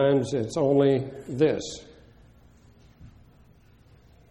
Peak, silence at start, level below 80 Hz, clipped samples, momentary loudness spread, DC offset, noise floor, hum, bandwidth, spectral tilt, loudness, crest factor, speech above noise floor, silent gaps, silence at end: -10 dBFS; 0 s; -58 dBFS; under 0.1%; 14 LU; under 0.1%; -56 dBFS; none; 11 kHz; -6.5 dB/octave; -25 LUFS; 18 dB; 32 dB; none; 1.2 s